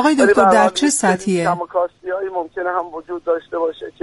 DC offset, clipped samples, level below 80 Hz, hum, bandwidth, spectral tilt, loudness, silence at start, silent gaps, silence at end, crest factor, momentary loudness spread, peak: under 0.1%; under 0.1%; -54 dBFS; none; 11.5 kHz; -4 dB/octave; -17 LUFS; 0 s; none; 0.1 s; 16 dB; 12 LU; -2 dBFS